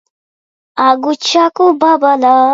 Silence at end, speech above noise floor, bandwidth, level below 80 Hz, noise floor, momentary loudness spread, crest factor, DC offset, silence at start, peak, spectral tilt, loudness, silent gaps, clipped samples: 0 s; over 80 dB; 7.8 kHz; -62 dBFS; under -90 dBFS; 4 LU; 12 dB; under 0.1%; 0.75 s; 0 dBFS; -2 dB/octave; -11 LUFS; none; under 0.1%